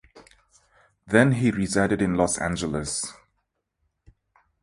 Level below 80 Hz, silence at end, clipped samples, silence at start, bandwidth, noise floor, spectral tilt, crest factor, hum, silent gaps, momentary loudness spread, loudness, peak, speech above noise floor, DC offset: -48 dBFS; 1.5 s; under 0.1%; 0.15 s; 11.5 kHz; -76 dBFS; -5 dB/octave; 24 dB; none; none; 9 LU; -23 LUFS; -2 dBFS; 54 dB; under 0.1%